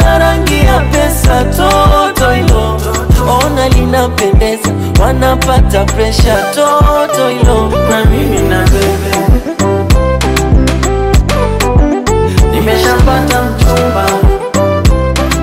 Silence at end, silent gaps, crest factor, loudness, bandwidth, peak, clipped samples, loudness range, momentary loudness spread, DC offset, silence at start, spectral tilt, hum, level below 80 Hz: 0 s; none; 8 dB; -10 LUFS; 16.5 kHz; 0 dBFS; under 0.1%; 1 LU; 3 LU; under 0.1%; 0 s; -5.5 dB/octave; none; -12 dBFS